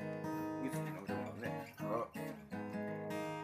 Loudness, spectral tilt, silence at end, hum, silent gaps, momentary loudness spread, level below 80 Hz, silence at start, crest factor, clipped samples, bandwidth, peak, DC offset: -43 LUFS; -6.5 dB/octave; 0 s; none; none; 4 LU; -74 dBFS; 0 s; 16 dB; under 0.1%; 15.5 kHz; -26 dBFS; under 0.1%